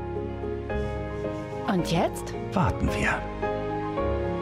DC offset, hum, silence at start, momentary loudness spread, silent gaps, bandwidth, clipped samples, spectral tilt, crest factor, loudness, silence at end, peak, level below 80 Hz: under 0.1%; none; 0 s; 7 LU; none; 16 kHz; under 0.1%; -6.5 dB/octave; 14 dB; -28 LUFS; 0 s; -14 dBFS; -38 dBFS